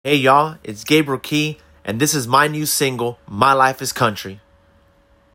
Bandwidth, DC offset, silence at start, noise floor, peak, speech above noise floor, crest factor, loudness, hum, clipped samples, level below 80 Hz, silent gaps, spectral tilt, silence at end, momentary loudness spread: 17 kHz; under 0.1%; 0.05 s; -55 dBFS; 0 dBFS; 37 dB; 18 dB; -17 LUFS; none; under 0.1%; -56 dBFS; none; -3.5 dB/octave; 0.95 s; 14 LU